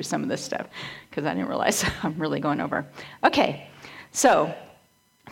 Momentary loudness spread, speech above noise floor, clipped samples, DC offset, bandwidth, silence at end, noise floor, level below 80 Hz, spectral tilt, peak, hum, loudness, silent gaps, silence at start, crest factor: 17 LU; 36 dB; under 0.1%; under 0.1%; 17 kHz; 0 s; -62 dBFS; -54 dBFS; -3.5 dB/octave; -4 dBFS; none; -25 LUFS; none; 0 s; 22 dB